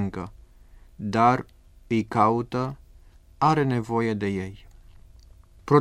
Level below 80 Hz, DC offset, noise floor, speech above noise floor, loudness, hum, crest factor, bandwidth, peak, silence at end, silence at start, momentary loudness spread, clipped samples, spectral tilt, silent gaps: -50 dBFS; under 0.1%; -51 dBFS; 27 dB; -24 LUFS; none; 20 dB; 13 kHz; -6 dBFS; 0 s; 0 s; 18 LU; under 0.1%; -7.5 dB/octave; none